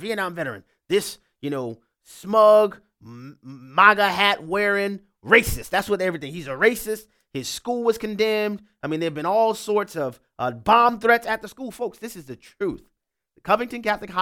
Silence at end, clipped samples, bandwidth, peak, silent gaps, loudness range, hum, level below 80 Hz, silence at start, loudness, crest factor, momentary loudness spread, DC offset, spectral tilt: 0 s; under 0.1%; 18 kHz; 0 dBFS; none; 5 LU; none; -48 dBFS; 0 s; -21 LUFS; 22 dB; 19 LU; under 0.1%; -4 dB/octave